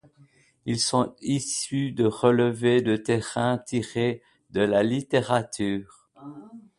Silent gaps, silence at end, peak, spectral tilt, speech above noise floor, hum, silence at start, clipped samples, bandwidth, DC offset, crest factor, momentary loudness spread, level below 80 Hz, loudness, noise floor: none; 0.2 s; -4 dBFS; -5 dB/octave; 34 dB; none; 0.65 s; under 0.1%; 11.5 kHz; under 0.1%; 20 dB; 13 LU; -60 dBFS; -25 LUFS; -59 dBFS